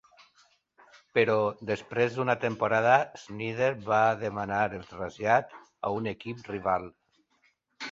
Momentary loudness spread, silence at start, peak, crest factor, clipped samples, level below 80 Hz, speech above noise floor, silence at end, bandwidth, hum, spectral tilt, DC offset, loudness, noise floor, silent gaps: 13 LU; 1.15 s; -6 dBFS; 22 dB; under 0.1%; -64 dBFS; 42 dB; 0 s; 7.8 kHz; none; -6 dB/octave; under 0.1%; -28 LUFS; -70 dBFS; none